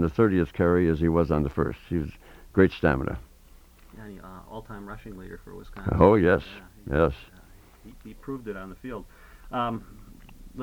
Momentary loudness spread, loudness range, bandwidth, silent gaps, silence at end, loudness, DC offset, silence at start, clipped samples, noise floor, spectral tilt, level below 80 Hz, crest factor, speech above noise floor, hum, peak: 22 LU; 9 LU; 17.5 kHz; none; 0 s; -25 LUFS; under 0.1%; 0 s; under 0.1%; -52 dBFS; -8.5 dB/octave; -42 dBFS; 24 dB; 27 dB; none; -4 dBFS